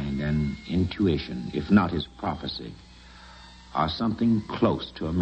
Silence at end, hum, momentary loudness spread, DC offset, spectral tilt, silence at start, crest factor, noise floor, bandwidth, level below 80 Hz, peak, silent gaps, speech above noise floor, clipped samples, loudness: 0 s; none; 17 LU; under 0.1%; -8 dB/octave; 0 s; 20 dB; -48 dBFS; 8.4 kHz; -44 dBFS; -6 dBFS; none; 22 dB; under 0.1%; -27 LUFS